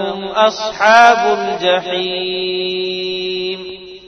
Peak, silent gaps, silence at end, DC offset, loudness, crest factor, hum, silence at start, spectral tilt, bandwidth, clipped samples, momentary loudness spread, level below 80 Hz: 0 dBFS; none; 0 s; under 0.1%; -14 LUFS; 16 dB; none; 0 s; -3 dB/octave; 9 kHz; 0.2%; 12 LU; -56 dBFS